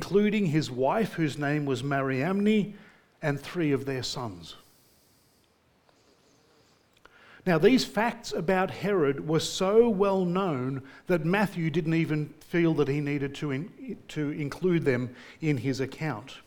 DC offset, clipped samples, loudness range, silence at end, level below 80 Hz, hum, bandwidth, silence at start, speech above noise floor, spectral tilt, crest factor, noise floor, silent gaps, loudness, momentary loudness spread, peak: under 0.1%; under 0.1%; 8 LU; 0.05 s; -58 dBFS; none; 19 kHz; 0 s; 39 dB; -6 dB/octave; 20 dB; -66 dBFS; none; -28 LUFS; 11 LU; -8 dBFS